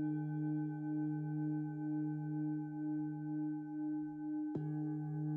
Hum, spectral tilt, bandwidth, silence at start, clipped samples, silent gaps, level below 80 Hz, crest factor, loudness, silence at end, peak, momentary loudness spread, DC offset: none; -12 dB/octave; 2.5 kHz; 0 s; under 0.1%; none; -80 dBFS; 12 dB; -41 LUFS; 0 s; -28 dBFS; 2 LU; under 0.1%